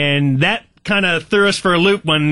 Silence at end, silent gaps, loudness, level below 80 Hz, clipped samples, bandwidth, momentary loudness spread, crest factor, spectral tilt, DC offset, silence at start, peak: 0 s; none; -15 LUFS; -48 dBFS; under 0.1%; 11.5 kHz; 3 LU; 12 dB; -5 dB/octave; 0.7%; 0 s; -4 dBFS